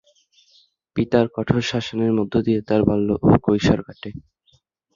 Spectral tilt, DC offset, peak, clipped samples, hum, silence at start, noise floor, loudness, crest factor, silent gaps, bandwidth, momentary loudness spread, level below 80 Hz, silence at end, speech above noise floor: -7 dB/octave; under 0.1%; -2 dBFS; under 0.1%; none; 0.95 s; -62 dBFS; -20 LUFS; 20 dB; none; 7.4 kHz; 12 LU; -42 dBFS; 0.75 s; 43 dB